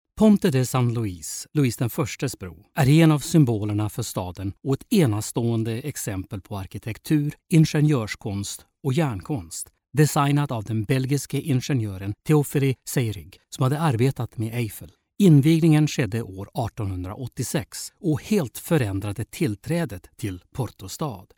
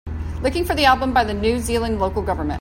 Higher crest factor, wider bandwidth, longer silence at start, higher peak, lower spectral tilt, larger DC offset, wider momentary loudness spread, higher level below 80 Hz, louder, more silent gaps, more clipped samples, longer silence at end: about the same, 18 dB vs 18 dB; first, 18.5 kHz vs 16.5 kHz; about the same, 0.15 s vs 0.05 s; about the same, -4 dBFS vs -2 dBFS; first, -6.5 dB/octave vs -5 dB/octave; neither; first, 14 LU vs 8 LU; second, -52 dBFS vs -32 dBFS; second, -24 LUFS vs -20 LUFS; neither; neither; first, 0.15 s vs 0 s